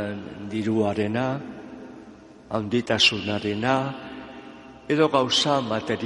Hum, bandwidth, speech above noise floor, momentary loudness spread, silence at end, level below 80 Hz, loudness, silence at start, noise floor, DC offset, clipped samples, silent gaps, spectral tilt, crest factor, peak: none; 11.5 kHz; 22 dB; 22 LU; 0 s; -60 dBFS; -23 LUFS; 0 s; -46 dBFS; under 0.1%; under 0.1%; none; -4.5 dB/octave; 20 dB; -6 dBFS